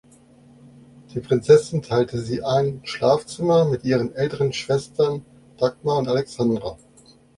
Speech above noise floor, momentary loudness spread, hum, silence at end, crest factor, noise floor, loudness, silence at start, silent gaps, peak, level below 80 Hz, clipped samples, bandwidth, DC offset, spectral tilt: 32 dB; 10 LU; none; 0.65 s; 20 dB; -52 dBFS; -21 LUFS; 1.1 s; none; -2 dBFS; -54 dBFS; under 0.1%; 11.5 kHz; under 0.1%; -6.5 dB/octave